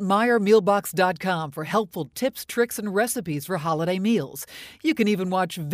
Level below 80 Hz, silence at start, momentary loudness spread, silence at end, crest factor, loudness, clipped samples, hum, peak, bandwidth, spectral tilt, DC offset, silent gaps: -64 dBFS; 0 s; 9 LU; 0 s; 16 dB; -24 LUFS; under 0.1%; none; -6 dBFS; 16 kHz; -5 dB/octave; under 0.1%; none